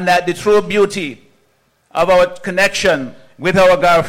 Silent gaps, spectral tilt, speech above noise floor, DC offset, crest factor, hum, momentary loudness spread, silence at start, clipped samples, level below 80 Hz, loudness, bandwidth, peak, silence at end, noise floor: none; -4.5 dB/octave; 45 dB; under 0.1%; 10 dB; none; 12 LU; 0 s; under 0.1%; -42 dBFS; -14 LUFS; 16 kHz; -4 dBFS; 0 s; -59 dBFS